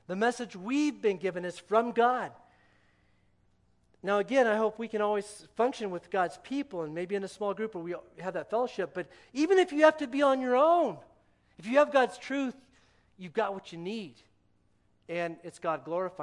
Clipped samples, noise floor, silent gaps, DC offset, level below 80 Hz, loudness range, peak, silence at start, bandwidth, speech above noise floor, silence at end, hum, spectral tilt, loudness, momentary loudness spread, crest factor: under 0.1%; -68 dBFS; none; under 0.1%; -74 dBFS; 8 LU; -8 dBFS; 0.1 s; 11.5 kHz; 39 dB; 0 s; 60 Hz at -65 dBFS; -5 dB/octave; -30 LUFS; 14 LU; 22 dB